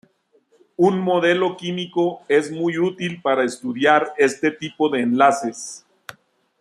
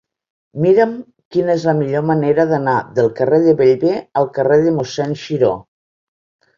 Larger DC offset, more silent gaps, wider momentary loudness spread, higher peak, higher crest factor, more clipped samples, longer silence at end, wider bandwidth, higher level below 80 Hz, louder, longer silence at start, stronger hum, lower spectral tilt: neither; second, none vs 1.25-1.31 s; about the same, 10 LU vs 8 LU; about the same, -2 dBFS vs -2 dBFS; about the same, 18 dB vs 14 dB; neither; second, 0.8 s vs 0.95 s; first, 12.5 kHz vs 7.4 kHz; second, -68 dBFS vs -56 dBFS; second, -20 LUFS vs -15 LUFS; first, 0.8 s vs 0.55 s; neither; second, -5 dB/octave vs -7.5 dB/octave